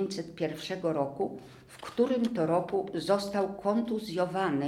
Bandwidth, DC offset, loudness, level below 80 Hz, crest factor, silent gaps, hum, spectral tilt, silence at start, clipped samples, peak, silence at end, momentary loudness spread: 15.5 kHz; under 0.1%; -31 LUFS; -66 dBFS; 16 dB; none; none; -6 dB/octave; 0 s; under 0.1%; -14 dBFS; 0 s; 8 LU